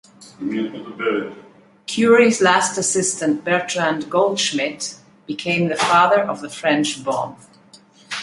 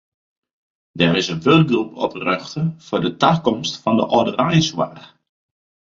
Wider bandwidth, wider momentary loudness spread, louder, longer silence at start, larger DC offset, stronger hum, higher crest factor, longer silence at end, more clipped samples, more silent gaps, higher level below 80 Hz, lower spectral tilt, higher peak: first, 11.5 kHz vs 7.6 kHz; first, 15 LU vs 9 LU; about the same, -18 LUFS vs -18 LUFS; second, 0.2 s vs 0.95 s; neither; neither; about the same, 18 dB vs 18 dB; second, 0 s vs 0.85 s; neither; neither; second, -66 dBFS vs -54 dBFS; second, -3.5 dB/octave vs -5.5 dB/octave; about the same, -2 dBFS vs -2 dBFS